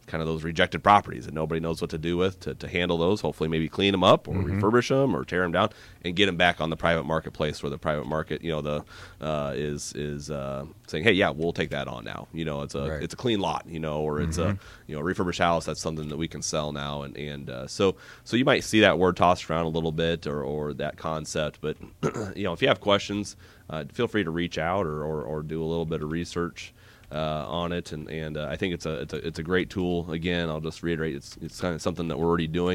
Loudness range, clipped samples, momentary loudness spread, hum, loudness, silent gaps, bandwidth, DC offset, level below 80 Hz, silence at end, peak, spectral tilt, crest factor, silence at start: 6 LU; under 0.1%; 13 LU; none; -27 LUFS; none; 16 kHz; under 0.1%; -48 dBFS; 0 s; -6 dBFS; -5 dB/octave; 22 dB; 0.05 s